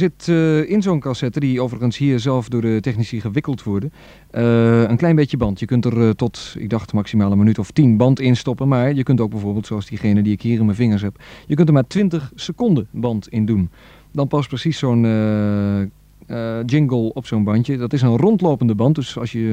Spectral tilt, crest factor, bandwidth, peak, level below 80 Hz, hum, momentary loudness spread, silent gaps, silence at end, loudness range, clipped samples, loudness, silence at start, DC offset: -8 dB/octave; 16 dB; 9.2 kHz; 0 dBFS; -46 dBFS; none; 9 LU; none; 0 s; 3 LU; under 0.1%; -18 LUFS; 0 s; under 0.1%